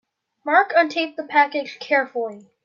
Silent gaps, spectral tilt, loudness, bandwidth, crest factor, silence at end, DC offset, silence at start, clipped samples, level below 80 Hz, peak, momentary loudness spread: none; -3.5 dB/octave; -20 LUFS; 7.4 kHz; 20 dB; 0.25 s; under 0.1%; 0.45 s; under 0.1%; -82 dBFS; -2 dBFS; 12 LU